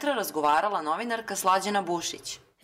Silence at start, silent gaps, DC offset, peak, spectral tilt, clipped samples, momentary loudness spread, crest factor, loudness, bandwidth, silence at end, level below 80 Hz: 0 s; none; under 0.1%; -14 dBFS; -2.5 dB/octave; under 0.1%; 8 LU; 14 dB; -27 LUFS; 16 kHz; 0.25 s; -70 dBFS